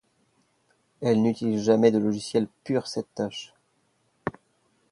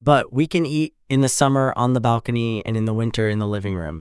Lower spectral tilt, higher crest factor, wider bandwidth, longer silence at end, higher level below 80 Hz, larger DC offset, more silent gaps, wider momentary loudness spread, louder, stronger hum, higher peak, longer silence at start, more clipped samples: about the same, -6.5 dB/octave vs -5.5 dB/octave; about the same, 22 dB vs 20 dB; about the same, 11.5 kHz vs 12 kHz; first, 0.6 s vs 0.2 s; second, -64 dBFS vs -48 dBFS; neither; neither; first, 16 LU vs 7 LU; second, -26 LUFS vs -21 LUFS; neither; second, -6 dBFS vs 0 dBFS; first, 1 s vs 0 s; neither